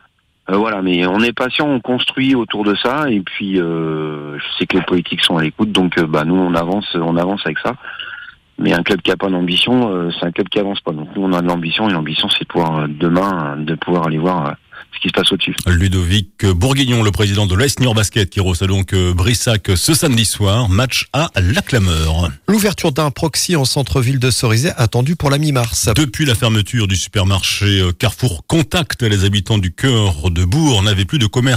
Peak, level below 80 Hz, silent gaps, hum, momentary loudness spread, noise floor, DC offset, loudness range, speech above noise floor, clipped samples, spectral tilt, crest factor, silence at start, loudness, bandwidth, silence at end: -2 dBFS; -36 dBFS; none; none; 6 LU; -34 dBFS; under 0.1%; 3 LU; 20 dB; under 0.1%; -4.5 dB/octave; 14 dB; 0.5 s; -15 LUFS; 16 kHz; 0 s